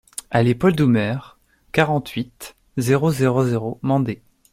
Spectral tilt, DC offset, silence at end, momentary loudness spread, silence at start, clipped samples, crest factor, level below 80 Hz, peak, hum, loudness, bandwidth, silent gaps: -6.5 dB/octave; under 0.1%; 0.4 s; 13 LU; 0.3 s; under 0.1%; 18 dB; -52 dBFS; -2 dBFS; none; -20 LUFS; 16 kHz; none